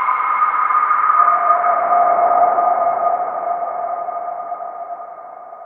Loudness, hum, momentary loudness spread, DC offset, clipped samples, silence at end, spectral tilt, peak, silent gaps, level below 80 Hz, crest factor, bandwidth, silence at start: -16 LUFS; none; 16 LU; under 0.1%; under 0.1%; 0 s; -7.5 dB/octave; -2 dBFS; none; -66 dBFS; 16 dB; 3.6 kHz; 0 s